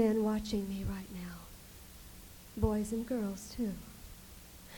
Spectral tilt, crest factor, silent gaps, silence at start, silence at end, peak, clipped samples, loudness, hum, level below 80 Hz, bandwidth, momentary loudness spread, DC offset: -6.5 dB/octave; 20 dB; none; 0 s; 0 s; -18 dBFS; under 0.1%; -37 LUFS; none; -48 dBFS; 19 kHz; 19 LU; under 0.1%